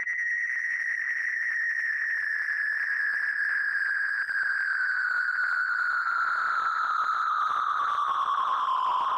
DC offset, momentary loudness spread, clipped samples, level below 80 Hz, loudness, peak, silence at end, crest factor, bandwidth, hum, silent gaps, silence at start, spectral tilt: under 0.1%; 1 LU; under 0.1%; -74 dBFS; -26 LUFS; -20 dBFS; 0 s; 8 dB; 14 kHz; none; none; 0 s; 0.5 dB/octave